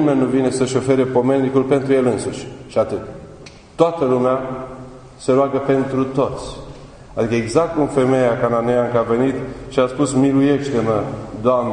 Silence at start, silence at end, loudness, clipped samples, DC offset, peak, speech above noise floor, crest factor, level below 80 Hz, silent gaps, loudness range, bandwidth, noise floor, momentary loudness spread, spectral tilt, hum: 0 s; 0 s; -18 LUFS; under 0.1%; under 0.1%; 0 dBFS; 23 dB; 18 dB; -44 dBFS; none; 3 LU; 10.5 kHz; -40 dBFS; 14 LU; -6.5 dB/octave; none